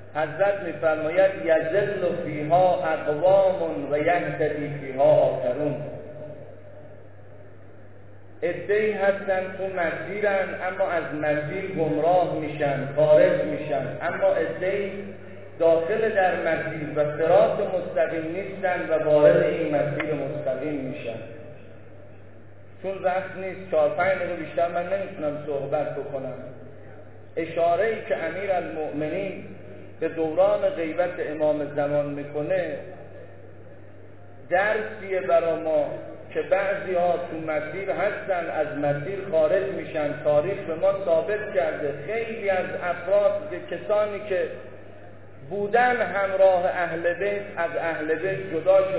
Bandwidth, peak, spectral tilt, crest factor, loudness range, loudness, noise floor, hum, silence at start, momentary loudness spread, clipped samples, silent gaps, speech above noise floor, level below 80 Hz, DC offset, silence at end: 4 kHz; -6 dBFS; -10 dB/octave; 20 dB; 6 LU; -24 LUFS; -48 dBFS; none; 0 s; 13 LU; under 0.1%; none; 24 dB; -62 dBFS; 0.6%; 0 s